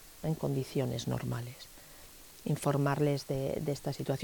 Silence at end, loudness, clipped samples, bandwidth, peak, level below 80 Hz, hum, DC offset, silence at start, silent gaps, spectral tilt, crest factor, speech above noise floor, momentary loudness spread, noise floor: 0 s; -34 LUFS; under 0.1%; 19.5 kHz; -18 dBFS; -58 dBFS; none; under 0.1%; 0 s; none; -6.5 dB/octave; 16 dB; 20 dB; 20 LU; -53 dBFS